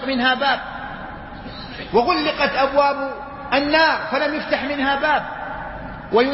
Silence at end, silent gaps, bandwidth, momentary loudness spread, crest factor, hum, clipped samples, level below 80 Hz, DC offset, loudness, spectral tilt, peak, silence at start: 0 s; none; 5.8 kHz; 16 LU; 16 dB; none; under 0.1%; -44 dBFS; under 0.1%; -19 LUFS; -8 dB/octave; -4 dBFS; 0 s